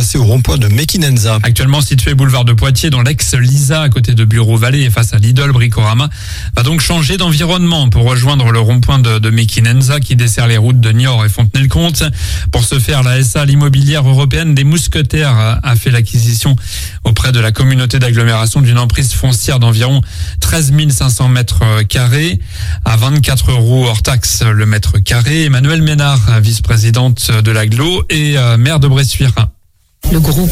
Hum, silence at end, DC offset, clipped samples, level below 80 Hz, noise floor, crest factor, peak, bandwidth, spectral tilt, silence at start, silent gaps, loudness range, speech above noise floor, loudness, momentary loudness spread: none; 0 s; under 0.1%; under 0.1%; -22 dBFS; -43 dBFS; 8 dB; 0 dBFS; 16 kHz; -5 dB/octave; 0 s; none; 1 LU; 34 dB; -10 LUFS; 3 LU